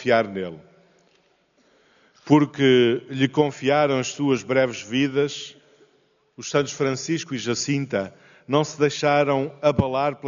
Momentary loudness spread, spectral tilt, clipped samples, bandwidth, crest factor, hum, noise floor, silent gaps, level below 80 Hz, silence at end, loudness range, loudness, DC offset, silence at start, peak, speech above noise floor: 9 LU; -4.5 dB/octave; under 0.1%; 7.4 kHz; 18 dB; none; -63 dBFS; none; -58 dBFS; 0 s; 5 LU; -22 LUFS; under 0.1%; 0 s; -4 dBFS; 41 dB